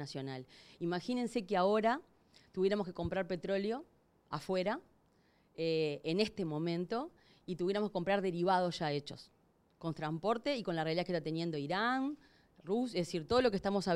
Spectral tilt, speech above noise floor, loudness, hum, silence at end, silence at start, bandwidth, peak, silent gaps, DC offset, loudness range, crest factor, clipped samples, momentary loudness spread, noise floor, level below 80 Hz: -6 dB/octave; 35 dB; -36 LUFS; none; 0 s; 0 s; 13 kHz; -18 dBFS; none; under 0.1%; 3 LU; 18 dB; under 0.1%; 13 LU; -71 dBFS; -66 dBFS